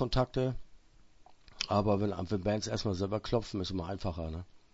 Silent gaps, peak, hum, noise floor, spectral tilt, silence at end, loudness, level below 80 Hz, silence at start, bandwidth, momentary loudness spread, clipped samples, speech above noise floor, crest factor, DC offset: none; -14 dBFS; none; -59 dBFS; -6 dB/octave; 0.15 s; -34 LUFS; -48 dBFS; 0 s; 8 kHz; 9 LU; under 0.1%; 26 dB; 20 dB; under 0.1%